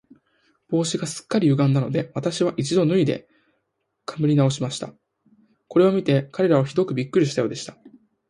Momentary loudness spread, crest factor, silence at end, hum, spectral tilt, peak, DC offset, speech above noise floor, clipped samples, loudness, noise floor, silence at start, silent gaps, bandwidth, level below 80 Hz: 13 LU; 18 dB; 0.4 s; none; -6.5 dB/octave; -6 dBFS; under 0.1%; 54 dB; under 0.1%; -22 LUFS; -75 dBFS; 0.7 s; none; 11.5 kHz; -64 dBFS